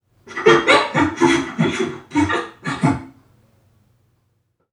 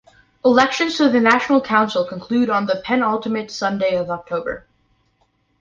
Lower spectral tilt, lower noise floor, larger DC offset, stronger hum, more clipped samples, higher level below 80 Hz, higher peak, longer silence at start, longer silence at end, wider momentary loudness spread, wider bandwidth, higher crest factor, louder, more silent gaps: about the same, -5 dB/octave vs -5 dB/octave; about the same, -66 dBFS vs -64 dBFS; neither; neither; neither; first, -50 dBFS vs -56 dBFS; about the same, 0 dBFS vs -2 dBFS; second, 0.25 s vs 0.45 s; first, 1.6 s vs 1.05 s; about the same, 11 LU vs 10 LU; first, 11 kHz vs 7.6 kHz; about the same, 20 dB vs 18 dB; about the same, -18 LUFS vs -18 LUFS; neither